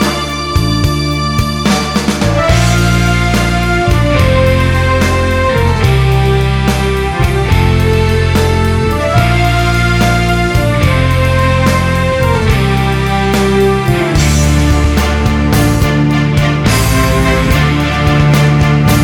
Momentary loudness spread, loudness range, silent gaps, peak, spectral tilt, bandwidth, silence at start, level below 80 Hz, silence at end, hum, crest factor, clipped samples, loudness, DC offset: 3 LU; 1 LU; none; 0 dBFS; -5.5 dB/octave; 18 kHz; 0 s; -18 dBFS; 0 s; none; 10 dB; under 0.1%; -11 LUFS; under 0.1%